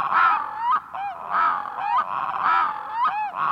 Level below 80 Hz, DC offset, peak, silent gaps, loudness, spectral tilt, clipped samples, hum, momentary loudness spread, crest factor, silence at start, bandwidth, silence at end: -68 dBFS; under 0.1%; -8 dBFS; none; -23 LUFS; -4 dB/octave; under 0.1%; none; 7 LU; 16 dB; 0 s; 7.6 kHz; 0 s